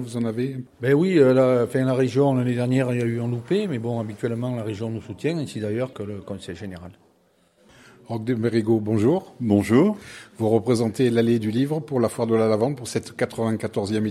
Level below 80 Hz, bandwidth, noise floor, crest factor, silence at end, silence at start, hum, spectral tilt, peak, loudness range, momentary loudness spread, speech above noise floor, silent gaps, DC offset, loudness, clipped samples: -64 dBFS; 14 kHz; -62 dBFS; 18 dB; 0 s; 0 s; none; -7 dB/octave; -4 dBFS; 9 LU; 12 LU; 40 dB; none; under 0.1%; -22 LUFS; under 0.1%